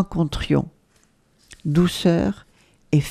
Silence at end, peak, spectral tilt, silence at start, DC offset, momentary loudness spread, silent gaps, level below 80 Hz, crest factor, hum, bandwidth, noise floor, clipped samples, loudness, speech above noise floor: 0 s; -4 dBFS; -6.5 dB/octave; 0 s; under 0.1%; 13 LU; none; -40 dBFS; 18 dB; none; 14 kHz; -60 dBFS; under 0.1%; -22 LUFS; 40 dB